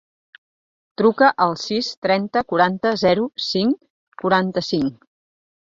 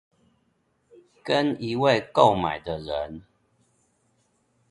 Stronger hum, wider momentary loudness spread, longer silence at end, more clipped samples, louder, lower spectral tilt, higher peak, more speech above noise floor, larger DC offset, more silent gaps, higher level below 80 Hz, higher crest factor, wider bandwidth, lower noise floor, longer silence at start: neither; second, 7 LU vs 16 LU; second, 0.85 s vs 1.5 s; neither; first, -20 LUFS vs -24 LUFS; about the same, -5.5 dB/octave vs -6 dB/octave; about the same, -2 dBFS vs -2 dBFS; first, over 71 dB vs 46 dB; neither; first, 1.97-2.02 s, 3.90-4.12 s vs none; second, -60 dBFS vs -54 dBFS; about the same, 20 dB vs 24 dB; second, 7.6 kHz vs 11 kHz; first, under -90 dBFS vs -70 dBFS; second, 1 s vs 1.25 s